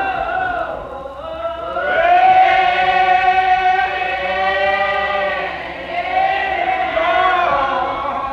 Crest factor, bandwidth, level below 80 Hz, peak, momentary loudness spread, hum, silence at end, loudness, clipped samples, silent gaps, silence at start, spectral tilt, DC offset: 14 dB; 7 kHz; -42 dBFS; -2 dBFS; 13 LU; none; 0 s; -16 LUFS; under 0.1%; none; 0 s; -4.5 dB/octave; under 0.1%